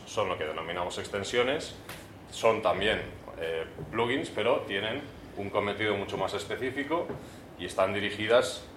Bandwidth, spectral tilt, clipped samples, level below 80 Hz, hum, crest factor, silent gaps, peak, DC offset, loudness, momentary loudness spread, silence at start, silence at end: 16 kHz; -4 dB/octave; under 0.1%; -58 dBFS; none; 22 dB; none; -10 dBFS; under 0.1%; -30 LUFS; 14 LU; 0 s; 0 s